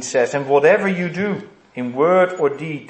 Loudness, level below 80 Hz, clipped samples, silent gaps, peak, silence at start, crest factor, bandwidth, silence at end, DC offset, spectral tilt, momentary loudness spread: -17 LUFS; -66 dBFS; under 0.1%; none; -2 dBFS; 0 s; 16 dB; 8.8 kHz; 0 s; under 0.1%; -5.5 dB/octave; 14 LU